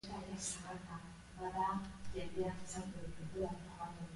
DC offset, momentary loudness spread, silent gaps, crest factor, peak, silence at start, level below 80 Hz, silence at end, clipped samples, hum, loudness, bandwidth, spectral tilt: under 0.1%; 9 LU; none; 16 dB; -28 dBFS; 0.05 s; -58 dBFS; 0 s; under 0.1%; none; -44 LUFS; 11.5 kHz; -4.5 dB/octave